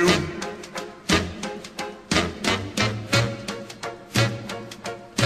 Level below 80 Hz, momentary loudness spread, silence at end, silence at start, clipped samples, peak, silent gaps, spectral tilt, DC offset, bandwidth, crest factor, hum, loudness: -46 dBFS; 12 LU; 0 s; 0 s; under 0.1%; -4 dBFS; none; -4 dB/octave; under 0.1%; 13 kHz; 20 dB; none; -26 LUFS